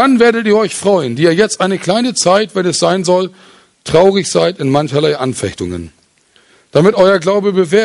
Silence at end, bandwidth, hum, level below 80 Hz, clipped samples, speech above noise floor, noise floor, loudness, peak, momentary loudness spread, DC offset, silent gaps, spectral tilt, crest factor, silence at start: 0 s; 11.5 kHz; none; -46 dBFS; under 0.1%; 40 dB; -52 dBFS; -12 LUFS; 0 dBFS; 9 LU; under 0.1%; none; -4.5 dB/octave; 12 dB; 0 s